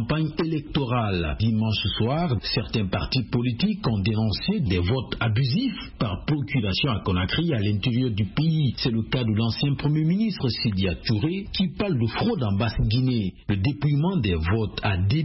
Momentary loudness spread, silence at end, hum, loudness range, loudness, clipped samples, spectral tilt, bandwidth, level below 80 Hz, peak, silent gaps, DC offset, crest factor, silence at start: 3 LU; 0 s; none; 1 LU; -24 LUFS; under 0.1%; -10 dB/octave; 5.8 kHz; -40 dBFS; -10 dBFS; none; under 0.1%; 14 dB; 0 s